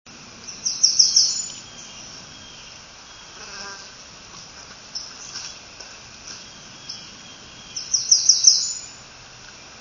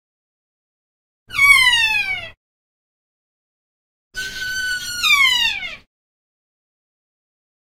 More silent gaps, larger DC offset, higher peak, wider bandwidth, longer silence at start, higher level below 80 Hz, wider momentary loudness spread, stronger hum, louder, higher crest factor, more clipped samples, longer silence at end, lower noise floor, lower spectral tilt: second, none vs 2.37-4.11 s; neither; about the same, 0 dBFS vs -2 dBFS; second, 7.4 kHz vs 16 kHz; second, 0.05 s vs 1.3 s; second, -58 dBFS vs -48 dBFS; first, 26 LU vs 18 LU; neither; about the same, -16 LUFS vs -14 LUFS; first, 26 dB vs 20 dB; neither; second, 0 s vs 1.9 s; second, -43 dBFS vs under -90 dBFS; about the same, 2 dB/octave vs 1.5 dB/octave